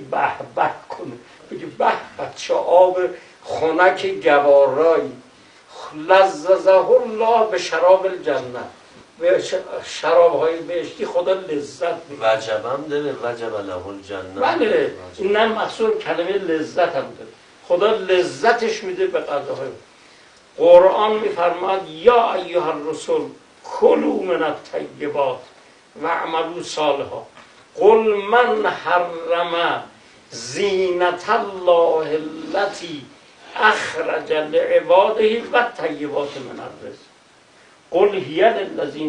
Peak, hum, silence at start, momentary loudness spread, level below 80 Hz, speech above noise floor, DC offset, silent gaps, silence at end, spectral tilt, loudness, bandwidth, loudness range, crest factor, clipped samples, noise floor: 0 dBFS; none; 0 s; 17 LU; -62 dBFS; 33 dB; under 0.1%; none; 0 s; -4 dB/octave; -18 LUFS; 10 kHz; 5 LU; 18 dB; under 0.1%; -51 dBFS